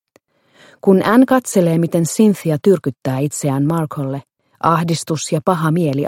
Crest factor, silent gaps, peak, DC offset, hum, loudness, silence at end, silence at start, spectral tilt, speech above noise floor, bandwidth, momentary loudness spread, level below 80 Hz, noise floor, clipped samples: 16 dB; none; 0 dBFS; under 0.1%; none; -16 LUFS; 0 s; 0.85 s; -6.5 dB/octave; 42 dB; 16.5 kHz; 8 LU; -58 dBFS; -57 dBFS; under 0.1%